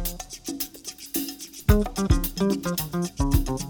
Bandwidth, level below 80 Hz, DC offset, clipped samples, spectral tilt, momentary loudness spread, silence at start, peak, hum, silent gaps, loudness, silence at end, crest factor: over 20 kHz; -30 dBFS; under 0.1%; under 0.1%; -5.5 dB/octave; 11 LU; 0 s; -6 dBFS; none; none; -26 LUFS; 0 s; 20 dB